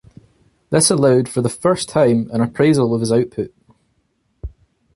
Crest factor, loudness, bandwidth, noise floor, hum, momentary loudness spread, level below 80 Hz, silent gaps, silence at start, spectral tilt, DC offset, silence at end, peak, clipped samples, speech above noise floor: 16 dB; -16 LUFS; 11.5 kHz; -65 dBFS; none; 20 LU; -44 dBFS; none; 0.7 s; -5 dB/octave; under 0.1%; 0.45 s; -2 dBFS; under 0.1%; 50 dB